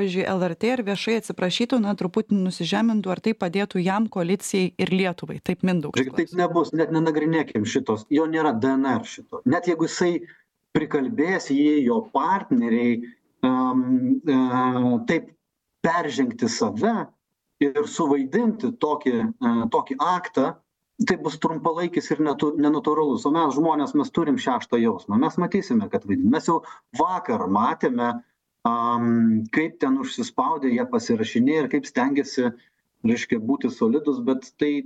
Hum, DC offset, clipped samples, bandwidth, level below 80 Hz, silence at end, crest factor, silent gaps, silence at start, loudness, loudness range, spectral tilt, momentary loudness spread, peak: none; under 0.1%; under 0.1%; 12 kHz; -64 dBFS; 0 s; 16 dB; none; 0 s; -23 LUFS; 2 LU; -6 dB/octave; 5 LU; -6 dBFS